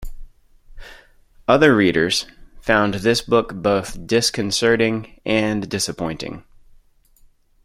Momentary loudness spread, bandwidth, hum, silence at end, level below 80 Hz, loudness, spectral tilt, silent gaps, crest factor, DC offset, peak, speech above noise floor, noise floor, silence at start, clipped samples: 13 LU; 16 kHz; none; 1.25 s; -42 dBFS; -19 LUFS; -4 dB/octave; none; 20 dB; under 0.1%; -2 dBFS; 35 dB; -53 dBFS; 0 s; under 0.1%